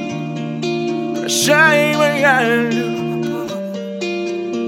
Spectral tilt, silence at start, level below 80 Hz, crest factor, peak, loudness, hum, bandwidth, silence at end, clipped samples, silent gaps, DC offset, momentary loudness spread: -4 dB/octave; 0 s; -64 dBFS; 16 dB; 0 dBFS; -16 LUFS; none; 17 kHz; 0 s; under 0.1%; none; under 0.1%; 13 LU